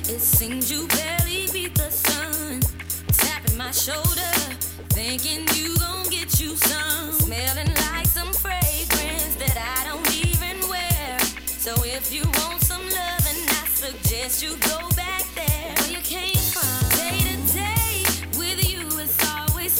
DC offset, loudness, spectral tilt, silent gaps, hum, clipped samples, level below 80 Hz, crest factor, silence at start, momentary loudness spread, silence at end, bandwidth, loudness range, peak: under 0.1%; -21 LUFS; -3 dB/octave; none; none; under 0.1%; -34 dBFS; 18 dB; 0 s; 5 LU; 0 s; 17.5 kHz; 1 LU; -4 dBFS